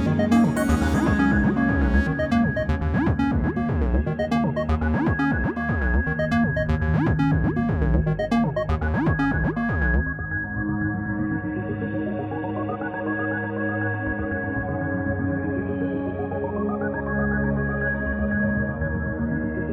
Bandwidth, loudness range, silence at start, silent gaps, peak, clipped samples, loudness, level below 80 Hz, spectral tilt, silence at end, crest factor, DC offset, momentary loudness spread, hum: 12.5 kHz; 5 LU; 0 s; none; -8 dBFS; under 0.1%; -24 LUFS; -30 dBFS; -8 dB/octave; 0 s; 14 dB; under 0.1%; 6 LU; none